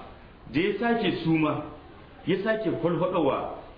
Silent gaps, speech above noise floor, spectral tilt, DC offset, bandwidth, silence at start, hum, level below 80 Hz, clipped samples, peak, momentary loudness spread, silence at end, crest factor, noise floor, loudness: none; 20 dB; -9.5 dB/octave; under 0.1%; 5.2 kHz; 0 s; none; -52 dBFS; under 0.1%; -12 dBFS; 12 LU; 0 s; 16 dB; -46 dBFS; -27 LUFS